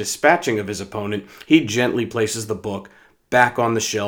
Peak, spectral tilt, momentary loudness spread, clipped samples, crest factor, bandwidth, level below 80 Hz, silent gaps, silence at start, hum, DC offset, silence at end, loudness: 0 dBFS; -4 dB/octave; 11 LU; under 0.1%; 20 dB; over 20 kHz; -60 dBFS; none; 0 s; none; under 0.1%; 0 s; -20 LUFS